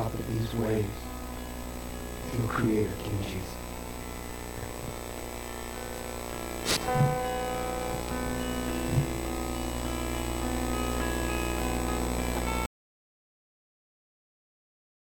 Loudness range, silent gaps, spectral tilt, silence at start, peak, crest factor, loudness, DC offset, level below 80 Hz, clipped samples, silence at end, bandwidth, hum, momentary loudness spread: 6 LU; none; -5 dB/octave; 0 s; -12 dBFS; 20 dB; -32 LUFS; under 0.1%; -40 dBFS; under 0.1%; 2.4 s; 18 kHz; 60 Hz at -40 dBFS; 11 LU